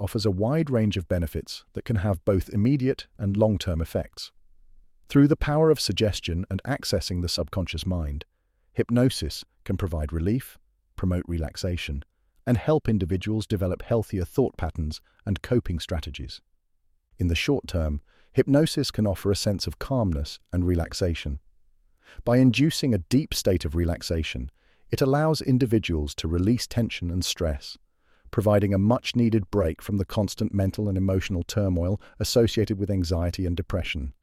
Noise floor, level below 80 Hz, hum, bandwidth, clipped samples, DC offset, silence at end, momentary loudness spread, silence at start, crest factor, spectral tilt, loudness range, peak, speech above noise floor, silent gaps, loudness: -67 dBFS; -38 dBFS; none; 15.5 kHz; under 0.1%; under 0.1%; 0.1 s; 11 LU; 0 s; 18 dB; -6 dB/octave; 4 LU; -8 dBFS; 42 dB; none; -26 LUFS